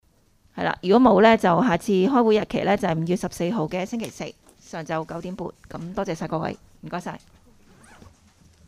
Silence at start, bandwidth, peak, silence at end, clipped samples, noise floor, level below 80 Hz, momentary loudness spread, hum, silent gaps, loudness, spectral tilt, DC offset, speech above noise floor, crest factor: 0.55 s; 15 kHz; -2 dBFS; 1.5 s; under 0.1%; -60 dBFS; -54 dBFS; 20 LU; none; none; -22 LUFS; -6.5 dB/octave; under 0.1%; 38 dB; 22 dB